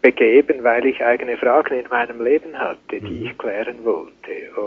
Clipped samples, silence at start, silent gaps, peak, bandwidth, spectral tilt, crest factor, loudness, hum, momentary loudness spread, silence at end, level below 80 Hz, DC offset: under 0.1%; 0.05 s; none; 0 dBFS; 5.2 kHz; -3 dB/octave; 18 dB; -19 LUFS; none; 15 LU; 0 s; -56 dBFS; under 0.1%